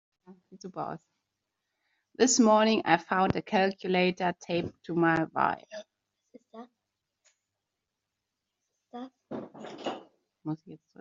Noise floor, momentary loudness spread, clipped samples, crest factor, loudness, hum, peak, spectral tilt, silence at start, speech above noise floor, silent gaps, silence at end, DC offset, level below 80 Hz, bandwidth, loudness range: -86 dBFS; 22 LU; under 0.1%; 24 dB; -28 LUFS; none; -6 dBFS; -4 dB/octave; 0.3 s; 58 dB; none; 0.25 s; under 0.1%; -68 dBFS; 7.4 kHz; 18 LU